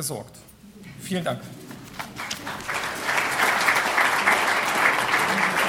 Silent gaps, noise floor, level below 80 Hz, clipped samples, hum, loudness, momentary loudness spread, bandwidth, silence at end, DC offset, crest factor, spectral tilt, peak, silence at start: none; -45 dBFS; -58 dBFS; under 0.1%; none; -22 LUFS; 17 LU; 19 kHz; 0 s; under 0.1%; 22 dB; -2.5 dB/octave; -4 dBFS; 0 s